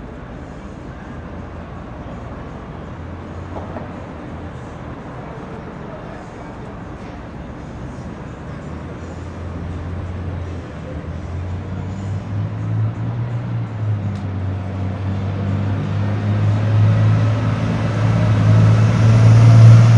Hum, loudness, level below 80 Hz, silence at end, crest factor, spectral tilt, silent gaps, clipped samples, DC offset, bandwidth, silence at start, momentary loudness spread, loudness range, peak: none; -17 LUFS; -38 dBFS; 0 s; 18 dB; -8 dB/octave; none; under 0.1%; under 0.1%; 7.2 kHz; 0 s; 19 LU; 16 LU; 0 dBFS